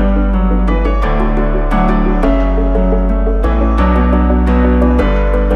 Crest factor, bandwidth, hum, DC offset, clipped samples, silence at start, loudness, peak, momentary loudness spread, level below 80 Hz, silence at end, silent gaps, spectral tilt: 10 dB; 4.8 kHz; none; under 0.1%; under 0.1%; 0 s; -13 LUFS; -2 dBFS; 3 LU; -12 dBFS; 0 s; none; -9.5 dB/octave